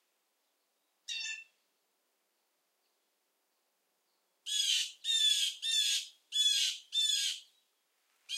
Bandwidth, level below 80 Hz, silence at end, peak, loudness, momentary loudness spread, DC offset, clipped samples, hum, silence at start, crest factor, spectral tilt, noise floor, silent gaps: 16.5 kHz; under -90 dBFS; 0 s; -18 dBFS; -30 LUFS; 14 LU; under 0.1%; under 0.1%; none; 1.1 s; 20 dB; 9.5 dB/octave; -80 dBFS; none